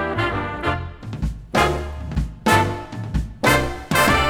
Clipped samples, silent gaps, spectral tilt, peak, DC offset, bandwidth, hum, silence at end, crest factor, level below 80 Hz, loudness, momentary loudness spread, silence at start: under 0.1%; none; -4.5 dB/octave; -2 dBFS; under 0.1%; over 20 kHz; none; 0 s; 20 dB; -30 dBFS; -21 LUFS; 11 LU; 0 s